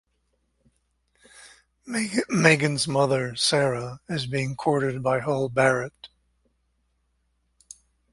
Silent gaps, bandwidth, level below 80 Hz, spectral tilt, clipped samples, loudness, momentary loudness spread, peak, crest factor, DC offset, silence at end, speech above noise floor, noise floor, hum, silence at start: none; 11.5 kHz; -60 dBFS; -4.5 dB/octave; under 0.1%; -24 LUFS; 11 LU; 0 dBFS; 26 dB; under 0.1%; 2.05 s; 48 dB; -72 dBFS; none; 1.4 s